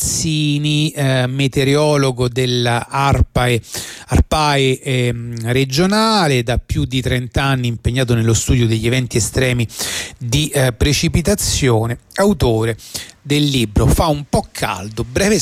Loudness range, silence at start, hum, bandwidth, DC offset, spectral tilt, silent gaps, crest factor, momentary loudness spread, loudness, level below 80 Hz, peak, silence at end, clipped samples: 1 LU; 0 s; none; 16 kHz; under 0.1%; -5 dB/octave; none; 12 dB; 7 LU; -16 LUFS; -28 dBFS; -4 dBFS; 0 s; under 0.1%